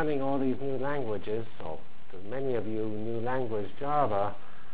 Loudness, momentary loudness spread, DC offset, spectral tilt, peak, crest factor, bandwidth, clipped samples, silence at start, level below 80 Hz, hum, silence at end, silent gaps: -33 LUFS; 13 LU; 4%; -10.5 dB/octave; -14 dBFS; 20 dB; 4 kHz; under 0.1%; 0 s; -58 dBFS; none; 0 s; none